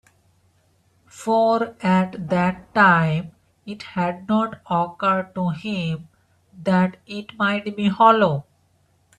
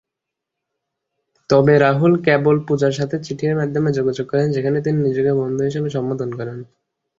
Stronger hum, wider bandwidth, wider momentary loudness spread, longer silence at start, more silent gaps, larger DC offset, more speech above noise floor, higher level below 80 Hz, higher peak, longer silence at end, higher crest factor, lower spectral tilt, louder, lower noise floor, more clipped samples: neither; first, 10 kHz vs 7.8 kHz; first, 15 LU vs 10 LU; second, 1.15 s vs 1.5 s; neither; neither; second, 42 dB vs 65 dB; about the same, -60 dBFS vs -56 dBFS; about the same, -2 dBFS vs -2 dBFS; first, 0.75 s vs 0.55 s; about the same, 20 dB vs 18 dB; about the same, -7 dB/octave vs -7.5 dB/octave; second, -21 LUFS vs -18 LUFS; second, -62 dBFS vs -82 dBFS; neither